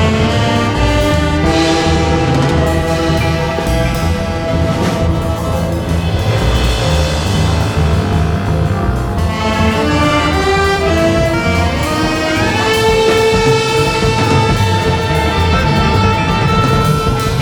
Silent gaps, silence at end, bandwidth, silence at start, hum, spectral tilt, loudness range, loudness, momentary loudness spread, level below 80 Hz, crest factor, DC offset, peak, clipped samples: none; 0 s; 19 kHz; 0 s; none; -5.5 dB/octave; 3 LU; -13 LUFS; 4 LU; -22 dBFS; 12 dB; under 0.1%; 0 dBFS; under 0.1%